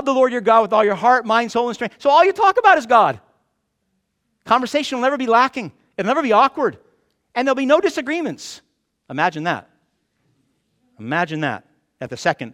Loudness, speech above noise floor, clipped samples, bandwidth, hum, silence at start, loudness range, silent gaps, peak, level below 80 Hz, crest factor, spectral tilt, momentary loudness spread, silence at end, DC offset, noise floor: -17 LUFS; 54 dB; under 0.1%; 13 kHz; none; 0 s; 10 LU; none; -2 dBFS; -64 dBFS; 18 dB; -4.5 dB/octave; 16 LU; 0 s; under 0.1%; -71 dBFS